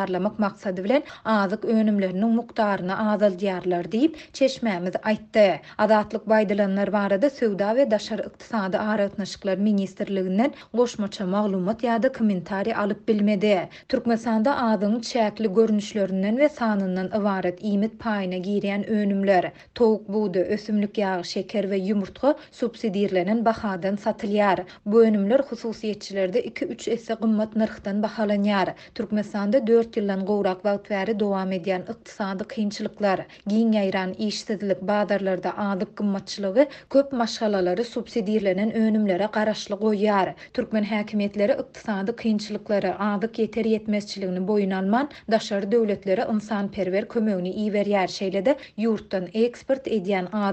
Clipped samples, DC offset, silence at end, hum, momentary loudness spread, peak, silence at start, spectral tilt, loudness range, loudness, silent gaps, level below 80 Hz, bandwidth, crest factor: under 0.1%; under 0.1%; 0 s; none; 6 LU; -6 dBFS; 0 s; -6.5 dB/octave; 3 LU; -24 LUFS; none; -60 dBFS; 8.4 kHz; 18 dB